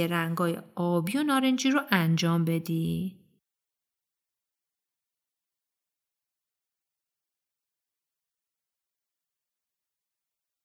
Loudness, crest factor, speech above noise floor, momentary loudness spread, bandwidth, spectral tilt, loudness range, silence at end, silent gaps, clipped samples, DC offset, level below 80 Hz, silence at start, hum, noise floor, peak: -27 LUFS; 26 dB; 62 dB; 7 LU; 16.5 kHz; -5.5 dB/octave; 12 LU; 7.5 s; none; under 0.1%; under 0.1%; -70 dBFS; 0 s; none; -89 dBFS; -6 dBFS